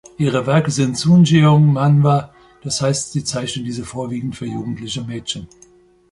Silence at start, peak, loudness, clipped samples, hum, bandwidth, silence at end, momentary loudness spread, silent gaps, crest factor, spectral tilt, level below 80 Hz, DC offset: 0.2 s; -2 dBFS; -17 LUFS; under 0.1%; none; 11.5 kHz; 0.65 s; 14 LU; none; 16 dB; -6 dB/octave; -50 dBFS; under 0.1%